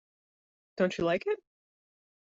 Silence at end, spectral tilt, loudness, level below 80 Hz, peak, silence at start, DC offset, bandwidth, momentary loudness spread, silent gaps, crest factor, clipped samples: 0.95 s; -4.5 dB/octave; -31 LUFS; -68 dBFS; -14 dBFS; 0.75 s; under 0.1%; 7.8 kHz; 10 LU; none; 20 dB; under 0.1%